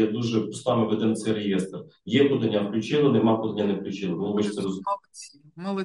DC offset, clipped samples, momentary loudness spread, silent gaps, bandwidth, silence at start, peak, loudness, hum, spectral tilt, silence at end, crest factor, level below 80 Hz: under 0.1%; under 0.1%; 13 LU; none; 11.5 kHz; 0 s; -8 dBFS; -25 LUFS; none; -6.5 dB/octave; 0 s; 16 dB; -68 dBFS